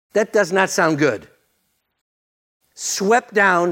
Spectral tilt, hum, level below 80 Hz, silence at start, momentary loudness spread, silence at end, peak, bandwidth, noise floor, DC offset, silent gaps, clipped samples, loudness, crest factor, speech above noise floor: -3.5 dB/octave; none; -68 dBFS; 0.15 s; 9 LU; 0 s; 0 dBFS; 16.5 kHz; -69 dBFS; under 0.1%; 2.01-2.61 s; under 0.1%; -18 LUFS; 18 dB; 52 dB